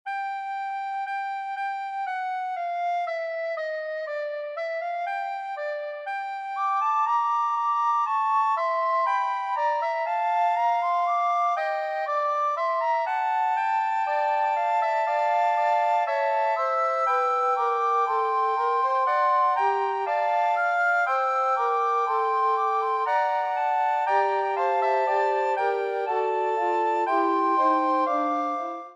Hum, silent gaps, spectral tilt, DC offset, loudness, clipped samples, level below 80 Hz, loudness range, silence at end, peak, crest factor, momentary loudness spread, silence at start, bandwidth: none; none; -2 dB/octave; under 0.1%; -25 LUFS; under 0.1%; under -90 dBFS; 6 LU; 0 s; -10 dBFS; 14 dB; 8 LU; 0.05 s; 9.4 kHz